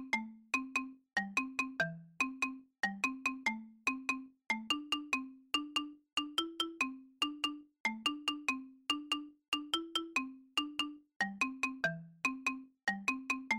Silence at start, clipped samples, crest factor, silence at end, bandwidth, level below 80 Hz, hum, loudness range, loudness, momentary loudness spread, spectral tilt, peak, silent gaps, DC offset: 0 s; under 0.1%; 16 dB; 0 s; 16.5 kHz; -74 dBFS; none; 1 LU; -37 LUFS; 4 LU; -2.5 dB/octave; -22 dBFS; 7.80-7.85 s, 9.48-9.52 s, 11.16-11.20 s; under 0.1%